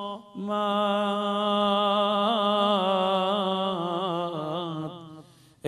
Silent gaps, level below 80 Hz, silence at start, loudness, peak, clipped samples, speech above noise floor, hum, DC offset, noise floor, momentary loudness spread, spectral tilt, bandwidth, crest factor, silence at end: none; -72 dBFS; 0 s; -25 LUFS; -10 dBFS; under 0.1%; 25 dB; none; under 0.1%; -51 dBFS; 11 LU; -6 dB/octave; 12 kHz; 16 dB; 0 s